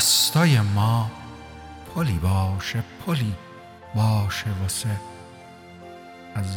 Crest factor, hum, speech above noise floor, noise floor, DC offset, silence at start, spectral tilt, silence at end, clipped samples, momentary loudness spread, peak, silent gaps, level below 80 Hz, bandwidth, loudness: 18 dB; none; 22 dB; -44 dBFS; under 0.1%; 0 s; -4 dB/octave; 0 s; under 0.1%; 24 LU; -6 dBFS; none; -46 dBFS; over 20 kHz; -23 LUFS